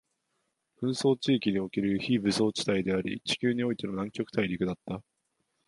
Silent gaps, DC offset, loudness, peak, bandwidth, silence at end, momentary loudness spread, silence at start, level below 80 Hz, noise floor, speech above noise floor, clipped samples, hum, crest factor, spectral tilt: none; under 0.1%; -29 LUFS; -12 dBFS; 11.5 kHz; 0.65 s; 7 LU; 0.8 s; -62 dBFS; -79 dBFS; 50 dB; under 0.1%; none; 18 dB; -5.5 dB/octave